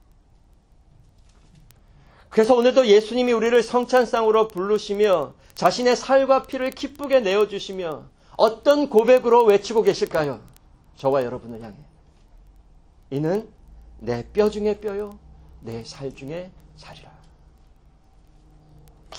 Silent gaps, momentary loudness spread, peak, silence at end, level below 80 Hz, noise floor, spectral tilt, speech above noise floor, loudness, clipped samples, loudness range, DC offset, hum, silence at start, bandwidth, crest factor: none; 19 LU; -2 dBFS; 0 s; -52 dBFS; -55 dBFS; -5 dB/octave; 35 dB; -20 LUFS; under 0.1%; 13 LU; under 0.1%; none; 2.3 s; 17 kHz; 20 dB